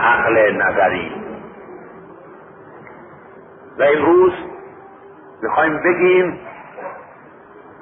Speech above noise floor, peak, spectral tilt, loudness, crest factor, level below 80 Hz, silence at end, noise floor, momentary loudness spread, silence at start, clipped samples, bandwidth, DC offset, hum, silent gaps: 27 dB; -2 dBFS; -10.5 dB/octave; -15 LUFS; 16 dB; -54 dBFS; 0.8 s; -42 dBFS; 25 LU; 0 s; under 0.1%; 3.8 kHz; under 0.1%; none; none